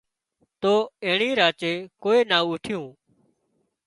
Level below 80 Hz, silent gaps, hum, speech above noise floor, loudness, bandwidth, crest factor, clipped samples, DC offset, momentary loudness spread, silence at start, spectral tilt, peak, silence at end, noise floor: -68 dBFS; none; none; 50 dB; -23 LUFS; 11.5 kHz; 20 dB; under 0.1%; under 0.1%; 12 LU; 0.6 s; -4.5 dB/octave; -4 dBFS; 0.95 s; -72 dBFS